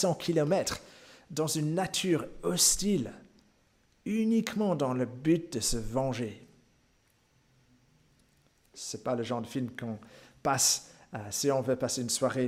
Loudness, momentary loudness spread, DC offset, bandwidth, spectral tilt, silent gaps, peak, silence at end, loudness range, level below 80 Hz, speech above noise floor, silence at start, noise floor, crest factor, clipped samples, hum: -30 LUFS; 15 LU; under 0.1%; 16 kHz; -4 dB/octave; none; -10 dBFS; 0 s; 10 LU; -54 dBFS; 39 dB; 0 s; -69 dBFS; 22 dB; under 0.1%; none